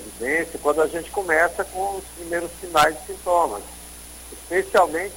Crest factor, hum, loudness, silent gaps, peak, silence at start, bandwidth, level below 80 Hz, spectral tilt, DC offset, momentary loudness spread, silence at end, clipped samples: 18 dB; none; -22 LUFS; none; -4 dBFS; 0 s; 17 kHz; -46 dBFS; -3 dB/octave; under 0.1%; 19 LU; 0 s; under 0.1%